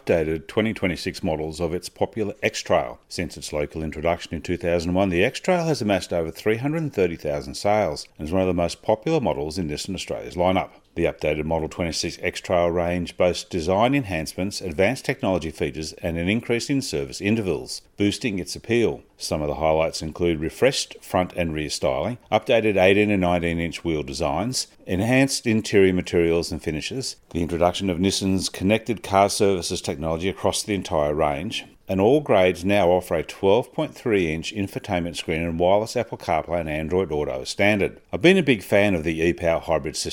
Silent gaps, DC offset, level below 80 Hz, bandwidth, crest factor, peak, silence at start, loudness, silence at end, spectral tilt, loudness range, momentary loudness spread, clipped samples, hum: none; under 0.1%; -44 dBFS; 17 kHz; 20 dB; -2 dBFS; 0.05 s; -23 LUFS; 0 s; -5 dB/octave; 4 LU; 9 LU; under 0.1%; none